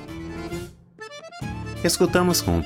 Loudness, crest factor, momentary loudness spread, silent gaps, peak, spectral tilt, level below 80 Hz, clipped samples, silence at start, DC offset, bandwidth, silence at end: -23 LUFS; 20 dB; 20 LU; none; -4 dBFS; -4.5 dB/octave; -42 dBFS; under 0.1%; 0 s; under 0.1%; 18.5 kHz; 0 s